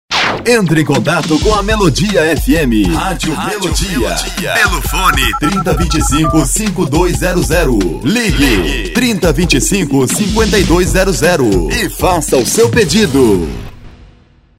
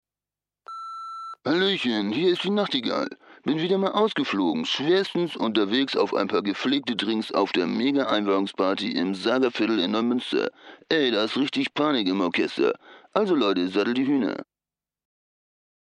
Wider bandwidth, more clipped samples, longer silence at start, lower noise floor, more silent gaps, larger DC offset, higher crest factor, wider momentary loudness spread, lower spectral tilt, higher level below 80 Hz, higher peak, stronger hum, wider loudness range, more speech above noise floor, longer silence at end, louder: first, 16.5 kHz vs 10.5 kHz; neither; second, 0.1 s vs 0.7 s; second, -44 dBFS vs under -90 dBFS; neither; neither; second, 12 dB vs 18 dB; about the same, 5 LU vs 7 LU; about the same, -4.5 dB/octave vs -5.5 dB/octave; first, -20 dBFS vs -80 dBFS; first, 0 dBFS vs -6 dBFS; neither; about the same, 2 LU vs 2 LU; second, 33 dB vs over 66 dB; second, 0.65 s vs 1.55 s; first, -12 LUFS vs -24 LUFS